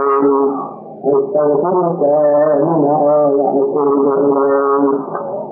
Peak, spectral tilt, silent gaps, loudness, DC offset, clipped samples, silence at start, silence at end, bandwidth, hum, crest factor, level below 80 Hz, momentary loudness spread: -4 dBFS; -14.5 dB/octave; none; -14 LUFS; under 0.1%; under 0.1%; 0 s; 0 s; 2.6 kHz; none; 10 dB; -70 dBFS; 8 LU